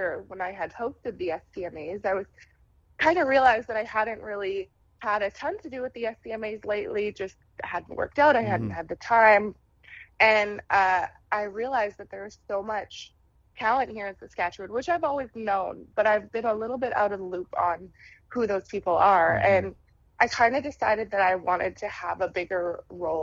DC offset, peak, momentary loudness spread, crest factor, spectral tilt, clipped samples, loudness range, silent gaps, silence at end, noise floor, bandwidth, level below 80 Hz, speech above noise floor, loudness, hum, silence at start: under 0.1%; -4 dBFS; 15 LU; 22 dB; -5 dB/octave; under 0.1%; 8 LU; none; 0 s; -50 dBFS; 7.6 kHz; -58 dBFS; 24 dB; -26 LUFS; none; 0 s